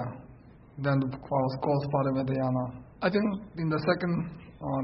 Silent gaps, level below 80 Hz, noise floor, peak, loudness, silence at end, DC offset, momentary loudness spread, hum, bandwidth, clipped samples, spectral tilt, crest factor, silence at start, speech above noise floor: none; -56 dBFS; -52 dBFS; -12 dBFS; -30 LUFS; 0 s; under 0.1%; 12 LU; none; 5.8 kHz; under 0.1%; -11.5 dB/octave; 18 dB; 0 s; 23 dB